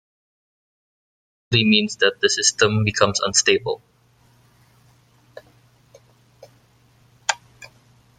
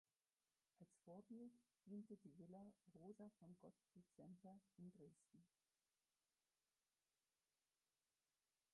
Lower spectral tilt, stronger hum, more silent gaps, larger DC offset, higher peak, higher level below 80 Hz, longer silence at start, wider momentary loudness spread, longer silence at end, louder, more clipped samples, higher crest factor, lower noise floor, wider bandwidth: second, -3 dB/octave vs -8 dB/octave; neither; neither; neither; first, -2 dBFS vs -50 dBFS; first, -58 dBFS vs under -90 dBFS; first, 1.5 s vs 0.8 s; first, 11 LU vs 7 LU; second, 0.55 s vs 3.25 s; first, -19 LUFS vs -65 LUFS; neither; about the same, 22 dB vs 18 dB; second, -57 dBFS vs under -90 dBFS; about the same, 10.5 kHz vs 11 kHz